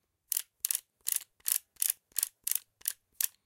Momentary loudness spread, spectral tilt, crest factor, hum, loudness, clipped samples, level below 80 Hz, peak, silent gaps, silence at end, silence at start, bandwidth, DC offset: 3 LU; 4.5 dB/octave; 30 dB; none; -33 LUFS; under 0.1%; -82 dBFS; -6 dBFS; none; 0.15 s; 0.3 s; 17 kHz; under 0.1%